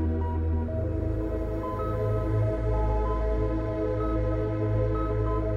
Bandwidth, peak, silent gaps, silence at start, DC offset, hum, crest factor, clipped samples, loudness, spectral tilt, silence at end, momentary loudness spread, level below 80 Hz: 4.8 kHz; -16 dBFS; none; 0 s; under 0.1%; none; 10 dB; under 0.1%; -28 LUFS; -10 dB/octave; 0 s; 3 LU; -32 dBFS